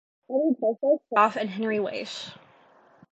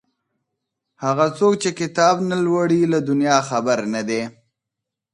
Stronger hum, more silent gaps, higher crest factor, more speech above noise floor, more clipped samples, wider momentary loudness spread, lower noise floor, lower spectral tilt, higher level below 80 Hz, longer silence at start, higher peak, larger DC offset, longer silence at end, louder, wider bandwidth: neither; neither; about the same, 22 dB vs 18 dB; second, 32 dB vs 65 dB; neither; first, 13 LU vs 7 LU; second, -57 dBFS vs -83 dBFS; about the same, -5.5 dB/octave vs -5 dB/octave; second, -80 dBFS vs -66 dBFS; second, 0.3 s vs 1 s; second, -6 dBFS vs -2 dBFS; neither; about the same, 0.75 s vs 0.85 s; second, -26 LUFS vs -19 LUFS; second, 8.2 kHz vs 11.5 kHz